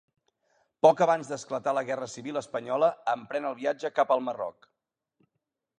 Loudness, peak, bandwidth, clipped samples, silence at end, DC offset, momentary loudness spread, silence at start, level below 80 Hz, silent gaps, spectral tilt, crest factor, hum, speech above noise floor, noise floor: -28 LUFS; -6 dBFS; 10 kHz; under 0.1%; 1.3 s; under 0.1%; 12 LU; 0.85 s; -78 dBFS; none; -5 dB/octave; 22 dB; none; 56 dB; -84 dBFS